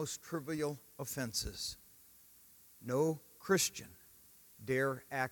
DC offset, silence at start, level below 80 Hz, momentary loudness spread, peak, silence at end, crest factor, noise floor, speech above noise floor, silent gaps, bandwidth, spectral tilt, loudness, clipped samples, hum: under 0.1%; 0 s; -62 dBFS; 25 LU; -18 dBFS; 0 s; 20 dB; -62 dBFS; 25 dB; none; 18 kHz; -3.5 dB/octave; -37 LUFS; under 0.1%; none